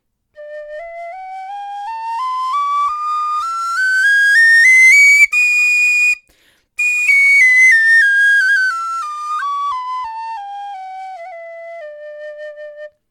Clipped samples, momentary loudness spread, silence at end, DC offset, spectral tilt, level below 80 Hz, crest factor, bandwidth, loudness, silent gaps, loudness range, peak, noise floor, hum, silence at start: under 0.1%; 25 LU; 0.2 s; under 0.1%; 4.5 dB/octave; -64 dBFS; 14 dB; 17.5 kHz; -10 LUFS; none; 16 LU; -2 dBFS; -55 dBFS; none; 0.4 s